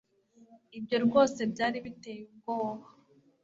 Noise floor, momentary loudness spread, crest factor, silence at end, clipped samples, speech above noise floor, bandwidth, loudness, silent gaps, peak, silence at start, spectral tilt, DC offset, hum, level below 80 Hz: -62 dBFS; 20 LU; 20 dB; 0.6 s; under 0.1%; 31 dB; 7.8 kHz; -30 LUFS; none; -12 dBFS; 0.5 s; -5 dB/octave; under 0.1%; none; -70 dBFS